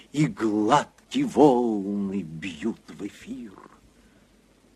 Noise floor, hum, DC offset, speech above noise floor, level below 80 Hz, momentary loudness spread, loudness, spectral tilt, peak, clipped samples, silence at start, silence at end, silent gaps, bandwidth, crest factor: -59 dBFS; none; under 0.1%; 34 dB; -62 dBFS; 20 LU; -24 LUFS; -6.5 dB/octave; -4 dBFS; under 0.1%; 0.15 s; 1.15 s; none; 12 kHz; 22 dB